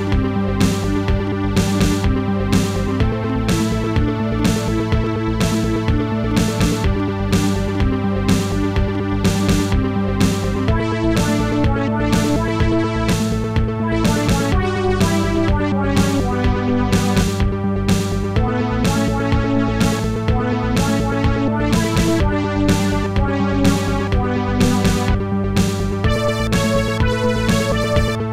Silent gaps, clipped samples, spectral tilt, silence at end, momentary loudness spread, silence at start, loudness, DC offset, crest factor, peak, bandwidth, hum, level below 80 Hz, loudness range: none; under 0.1%; -6 dB/octave; 0 s; 3 LU; 0 s; -18 LUFS; 0.5%; 14 dB; -4 dBFS; 16 kHz; none; -26 dBFS; 1 LU